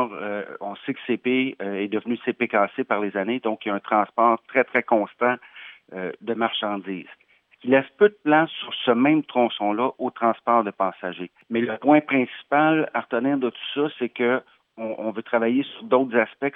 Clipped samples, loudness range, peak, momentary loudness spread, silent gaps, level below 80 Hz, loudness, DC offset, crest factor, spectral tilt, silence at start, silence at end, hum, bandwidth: under 0.1%; 4 LU; -4 dBFS; 12 LU; none; -84 dBFS; -23 LUFS; under 0.1%; 20 dB; -8.5 dB/octave; 0 s; 0.05 s; none; 3.9 kHz